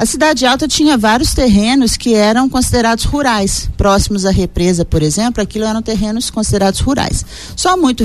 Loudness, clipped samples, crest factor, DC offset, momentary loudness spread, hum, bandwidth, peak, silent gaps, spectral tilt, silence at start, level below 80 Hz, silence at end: -13 LUFS; under 0.1%; 12 dB; 0.7%; 6 LU; none; 13.5 kHz; -2 dBFS; none; -4.5 dB/octave; 0 s; -24 dBFS; 0 s